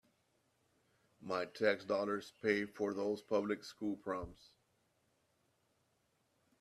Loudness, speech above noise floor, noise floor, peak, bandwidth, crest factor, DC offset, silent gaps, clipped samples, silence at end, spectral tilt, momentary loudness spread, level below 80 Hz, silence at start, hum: -39 LUFS; 41 dB; -79 dBFS; -18 dBFS; 13 kHz; 24 dB; under 0.1%; none; under 0.1%; 2.25 s; -5.5 dB/octave; 8 LU; -72 dBFS; 1.2 s; none